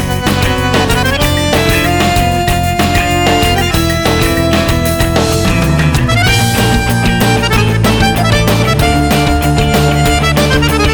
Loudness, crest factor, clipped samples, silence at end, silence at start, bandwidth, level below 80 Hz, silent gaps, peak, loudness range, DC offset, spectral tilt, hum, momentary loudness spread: -11 LUFS; 10 dB; under 0.1%; 0 s; 0 s; over 20 kHz; -20 dBFS; none; 0 dBFS; 1 LU; under 0.1%; -5 dB/octave; none; 2 LU